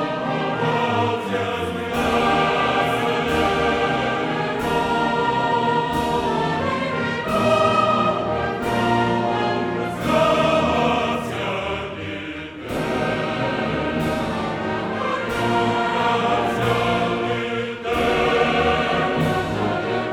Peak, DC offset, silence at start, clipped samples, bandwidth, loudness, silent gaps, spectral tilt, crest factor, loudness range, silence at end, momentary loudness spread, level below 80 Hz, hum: -6 dBFS; under 0.1%; 0 s; under 0.1%; 18 kHz; -21 LUFS; none; -5.5 dB/octave; 16 dB; 4 LU; 0 s; 6 LU; -42 dBFS; none